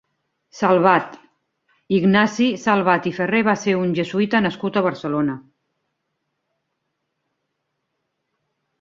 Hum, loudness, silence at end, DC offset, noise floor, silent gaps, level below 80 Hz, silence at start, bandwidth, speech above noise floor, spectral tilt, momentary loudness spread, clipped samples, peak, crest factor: none; -19 LUFS; 3.4 s; under 0.1%; -76 dBFS; none; -62 dBFS; 0.55 s; 7.6 kHz; 57 dB; -6 dB/octave; 7 LU; under 0.1%; -2 dBFS; 20 dB